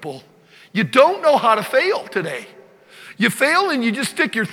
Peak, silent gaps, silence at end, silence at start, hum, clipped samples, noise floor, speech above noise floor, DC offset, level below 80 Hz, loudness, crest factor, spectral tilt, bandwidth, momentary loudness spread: 0 dBFS; none; 0 s; 0 s; none; under 0.1%; -44 dBFS; 27 dB; under 0.1%; -72 dBFS; -17 LUFS; 18 dB; -4 dB/octave; 17 kHz; 13 LU